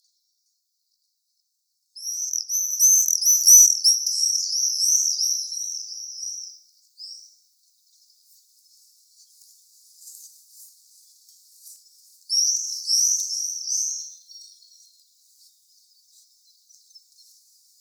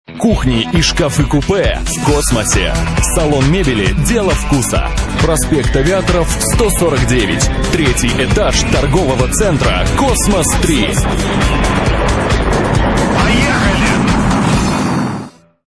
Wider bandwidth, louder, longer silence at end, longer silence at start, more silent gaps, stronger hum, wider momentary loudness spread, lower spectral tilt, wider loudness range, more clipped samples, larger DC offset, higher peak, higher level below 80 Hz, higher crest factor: first, over 20 kHz vs 11 kHz; second, -18 LUFS vs -13 LUFS; first, 3.35 s vs 0.35 s; first, 1.95 s vs 0.1 s; neither; neither; first, 24 LU vs 3 LU; second, 12.5 dB/octave vs -4.5 dB/octave; first, 17 LU vs 1 LU; neither; neither; about the same, 0 dBFS vs 0 dBFS; second, under -90 dBFS vs -18 dBFS; first, 26 dB vs 12 dB